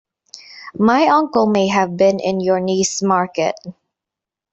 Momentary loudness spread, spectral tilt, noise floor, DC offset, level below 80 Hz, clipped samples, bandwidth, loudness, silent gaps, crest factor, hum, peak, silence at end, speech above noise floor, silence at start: 18 LU; -4.5 dB/octave; -86 dBFS; under 0.1%; -58 dBFS; under 0.1%; 8.2 kHz; -16 LUFS; none; 16 dB; none; -2 dBFS; 0.8 s; 70 dB; 0.5 s